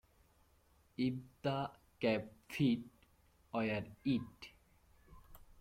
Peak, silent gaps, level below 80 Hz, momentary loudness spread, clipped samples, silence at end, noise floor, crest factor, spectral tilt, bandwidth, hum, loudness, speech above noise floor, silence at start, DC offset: -22 dBFS; none; -68 dBFS; 18 LU; under 0.1%; 0.2 s; -71 dBFS; 18 dB; -7 dB/octave; 16 kHz; none; -39 LUFS; 33 dB; 1 s; under 0.1%